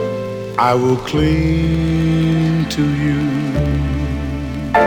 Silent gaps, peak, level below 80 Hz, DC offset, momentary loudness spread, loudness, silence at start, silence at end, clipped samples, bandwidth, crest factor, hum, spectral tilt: none; -2 dBFS; -28 dBFS; under 0.1%; 7 LU; -17 LUFS; 0 s; 0 s; under 0.1%; 17 kHz; 14 dB; none; -7 dB/octave